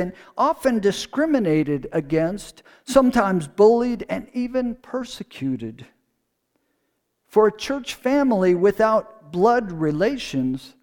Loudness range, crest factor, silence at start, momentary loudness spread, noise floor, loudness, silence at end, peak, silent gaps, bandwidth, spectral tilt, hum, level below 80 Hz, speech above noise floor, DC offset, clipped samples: 7 LU; 18 dB; 0 s; 13 LU; -74 dBFS; -21 LUFS; 0.15 s; -2 dBFS; none; 19 kHz; -6 dB/octave; none; -50 dBFS; 53 dB; under 0.1%; under 0.1%